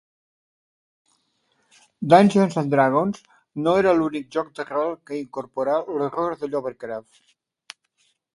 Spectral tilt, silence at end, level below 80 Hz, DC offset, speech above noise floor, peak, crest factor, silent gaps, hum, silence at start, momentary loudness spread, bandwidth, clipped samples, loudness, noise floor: -7 dB/octave; 1.35 s; -64 dBFS; under 0.1%; 47 dB; 0 dBFS; 24 dB; none; none; 2 s; 16 LU; 11.5 kHz; under 0.1%; -22 LUFS; -68 dBFS